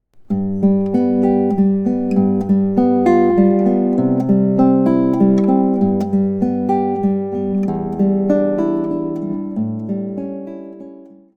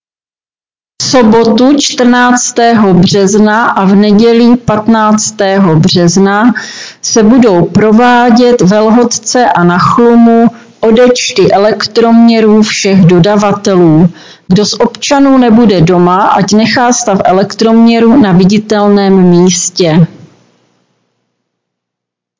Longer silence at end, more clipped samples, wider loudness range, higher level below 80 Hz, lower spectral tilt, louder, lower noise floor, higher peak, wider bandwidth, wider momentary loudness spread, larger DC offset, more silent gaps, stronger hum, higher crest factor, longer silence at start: second, 0.35 s vs 2.35 s; second, under 0.1% vs 5%; first, 5 LU vs 1 LU; second, -54 dBFS vs -40 dBFS; first, -10.5 dB/octave vs -5 dB/octave; second, -16 LUFS vs -6 LUFS; second, -39 dBFS vs under -90 dBFS; about the same, -2 dBFS vs 0 dBFS; second, 4.8 kHz vs 7.6 kHz; first, 10 LU vs 4 LU; neither; neither; neither; first, 14 dB vs 6 dB; second, 0.2 s vs 1 s